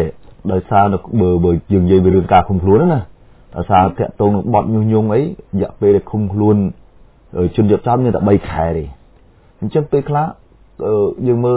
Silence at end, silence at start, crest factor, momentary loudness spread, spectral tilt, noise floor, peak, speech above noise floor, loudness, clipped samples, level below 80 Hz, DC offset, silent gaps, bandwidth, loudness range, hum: 0 s; 0 s; 14 dB; 10 LU; -12.5 dB/octave; -47 dBFS; 0 dBFS; 33 dB; -15 LUFS; under 0.1%; -32 dBFS; under 0.1%; none; 4 kHz; 4 LU; none